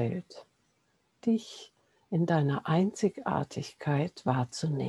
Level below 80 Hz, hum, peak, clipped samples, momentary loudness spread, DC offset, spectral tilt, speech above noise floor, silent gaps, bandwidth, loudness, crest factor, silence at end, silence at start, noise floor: -70 dBFS; none; -12 dBFS; under 0.1%; 11 LU; under 0.1%; -7 dB/octave; 43 dB; none; 11.5 kHz; -31 LUFS; 20 dB; 0 s; 0 s; -73 dBFS